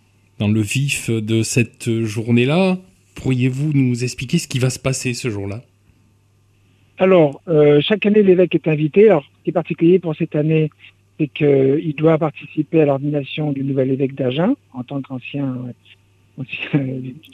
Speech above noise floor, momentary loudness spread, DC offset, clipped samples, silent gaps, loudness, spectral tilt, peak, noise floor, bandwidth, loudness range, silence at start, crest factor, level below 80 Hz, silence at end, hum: 39 dB; 13 LU; under 0.1%; under 0.1%; none; -18 LUFS; -6.5 dB/octave; -2 dBFS; -56 dBFS; 14.5 kHz; 7 LU; 0.4 s; 16 dB; -54 dBFS; 0.15 s; none